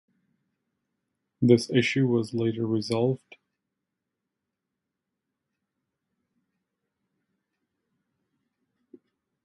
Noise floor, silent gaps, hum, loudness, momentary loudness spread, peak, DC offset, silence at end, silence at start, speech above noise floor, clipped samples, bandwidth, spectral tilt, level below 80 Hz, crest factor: -85 dBFS; none; none; -25 LUFS; 7 LU; -6 dBFS; under 0.1%; 6.3 s; 1.4 s; 61 dB; under 0.1%; 11.5 kHz; -6.5 dB/octave; -70 dBFS; 26 dB